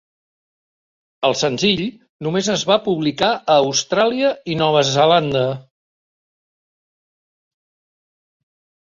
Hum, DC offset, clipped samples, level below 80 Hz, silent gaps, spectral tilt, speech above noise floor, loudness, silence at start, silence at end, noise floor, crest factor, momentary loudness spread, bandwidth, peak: none; under 0.1%; under 0.1%; -58 dBFS; 2.09-2.19 s; -4 dB/octave; over 73 dB; -17 LUFS; 1.2 s; 3.25 s; under -90 dBFS; 18 dB; 8 LU; 7.8 kHz; -2 dBFS